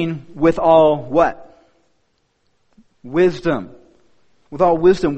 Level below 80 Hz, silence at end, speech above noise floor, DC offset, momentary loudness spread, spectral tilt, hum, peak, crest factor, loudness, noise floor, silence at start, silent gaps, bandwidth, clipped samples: -44 dBFS; 0 s; 49 dB; under 0.1%; 12 LU; -7.5 dB/octave; none; 0 dBFS; 18 dB; -16 LUFS; -65 dBFS; 0 s; none; 8.4 kHz; under 0.1%